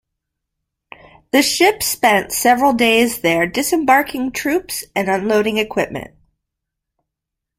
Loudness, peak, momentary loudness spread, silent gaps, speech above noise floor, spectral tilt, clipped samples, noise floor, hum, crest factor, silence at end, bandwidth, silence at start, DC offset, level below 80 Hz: -16 LUFS; -2 dBFS; 8 LU; none; 66 dB; -3 dB/octave; under 0.1%; -82 dBFS; none; 16 dB; 1.5 s; 16.5 kHz; 1.35 s; under 0.1%; -52 dBFS